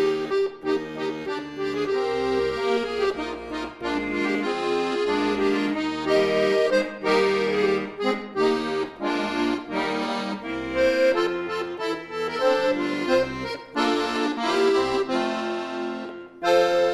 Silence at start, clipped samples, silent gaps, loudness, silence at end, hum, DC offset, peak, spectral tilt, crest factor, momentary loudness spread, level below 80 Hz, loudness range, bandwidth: 0 s; under 0.1%; none; -24 LUFS; 0 s; none; under 0.1%; -6 dBFS; -4.5 dB/octave; 18 dB; 9 LU; -54 dBFS; 3 LU; 12.5 kHz